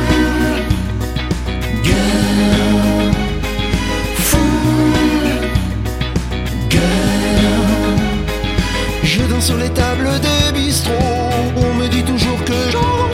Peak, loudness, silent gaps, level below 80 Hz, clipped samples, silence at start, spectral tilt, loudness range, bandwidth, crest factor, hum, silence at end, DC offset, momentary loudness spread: 0 dBFS; -15 LUFS; none; -22 dBFS; under 0.1%; 0 s; -5 dB/octave; 1 LU; 16.5 kHz; 14 dB; none; 0 s; 0.3%; 6 LU